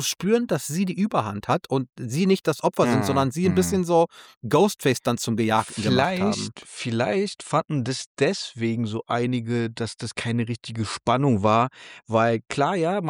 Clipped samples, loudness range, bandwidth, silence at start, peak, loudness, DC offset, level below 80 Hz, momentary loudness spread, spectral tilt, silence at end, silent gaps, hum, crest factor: under 0.1%; 4 LU; 19.5 kHz; 0 s; -6 dBFS; -24 LUFS; under 0.1%; -60 dBFS; 8 LU; -5.5 dB/octave; 0 s; 4.37-4.41 s, 8.06-8.15 s; none; 16 dB